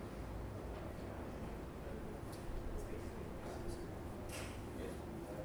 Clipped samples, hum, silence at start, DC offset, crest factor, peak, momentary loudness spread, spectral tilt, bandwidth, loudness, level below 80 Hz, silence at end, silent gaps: under 0.1%; none; 0 s; under 0.1%; 14 dB; -32 dBFS; 2 LU; -6 dB/octave; over 20 kHz; -48 LUFS; -52 dBFS; 0 s; none